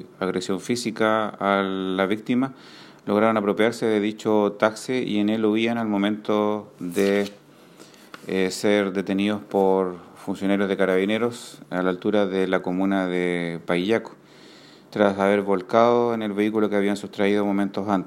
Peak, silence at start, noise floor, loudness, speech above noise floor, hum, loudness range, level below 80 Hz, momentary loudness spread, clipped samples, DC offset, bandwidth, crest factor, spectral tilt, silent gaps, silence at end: -2 dBFS; 0 s; -48 dBFS; -23 LUFS; 26 dB; none; 3 LU; -70 dBFS; 7 LU; under 0.1%; under 0.1%; 15.5 kHz; 20 dB; -6 dB/octave; none; 0 s